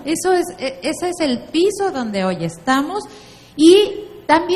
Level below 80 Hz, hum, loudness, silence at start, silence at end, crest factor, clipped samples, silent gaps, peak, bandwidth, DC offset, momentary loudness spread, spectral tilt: -52 dBFS; none; -17 LUFS; 0 s; 0 s; 18 dB; under 0.1%; none; 0 dBFS; 13 kHz; under 0.1%; 14 LU; -4 dB/octave